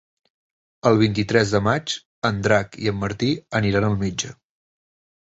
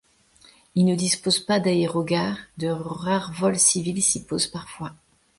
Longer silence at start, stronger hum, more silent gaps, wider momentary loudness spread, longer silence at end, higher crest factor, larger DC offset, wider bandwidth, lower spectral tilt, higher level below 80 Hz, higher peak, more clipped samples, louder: about the same, 0.85 s vs 0.75 s; neither; first, 2.06-2.22 s vs none; second, 8 LU vs 11 LU; first, 0.9 s vs 0.45 s; about the same, 20 dB vs 18 dB; neither; second, 8 kHz vs 11.5 kHz; first, -5.5 dB/octave vs -3.5 dB/octave; first, -46 dBFS vs -58 dBFS; about the same, -4 dBFS vs -6 dBFS; neither; about the same, -21 LUFS vs -22 LUFS